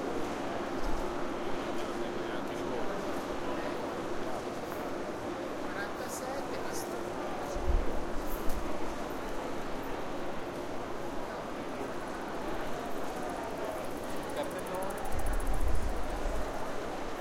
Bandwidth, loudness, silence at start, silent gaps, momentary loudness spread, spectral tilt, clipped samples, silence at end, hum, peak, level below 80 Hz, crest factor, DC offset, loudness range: 16.5 kHz; -37 LUFS; 0 s; none; 3 LU; -5 dB/octave; under 0.1%; 0 s; none; -14 dBFS; -40 dBFS; 18 dB; under 0.1%; 2 LU